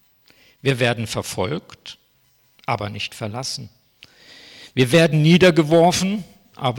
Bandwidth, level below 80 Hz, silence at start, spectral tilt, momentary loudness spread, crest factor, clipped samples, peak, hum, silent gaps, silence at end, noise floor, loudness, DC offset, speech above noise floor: 17 kHz; -54 dBFS; 0.65 s; -5.5 dB/octave; 17 LU; 16 dB; under 0.1%; -6 dBFS; none; none; 0 s; -60 dBFS; -19 LUFS; under 0.1%; 42 dB